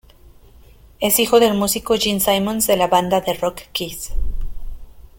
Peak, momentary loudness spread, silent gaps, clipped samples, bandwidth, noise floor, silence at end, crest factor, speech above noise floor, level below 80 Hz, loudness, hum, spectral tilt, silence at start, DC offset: -2 dBFS; 15 LU; none; under 0.1%; 17 kHz; -46 dBFS; 0.2 s; 18 dB; 28 dB; -30 dBFS; -18 LUFS; none; -3.5 dB/octave; 1 s; under 0.1%